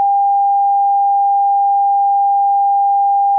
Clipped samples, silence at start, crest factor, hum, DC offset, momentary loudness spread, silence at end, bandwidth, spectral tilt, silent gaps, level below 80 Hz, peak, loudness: under 0.1%; 0 s; 4 dB; none; under 0.1%; 0 LU; 0 s; 1 kHz; -3 dB/octave; none; under -90 dBFS; -10 dBFS; -13 LUFS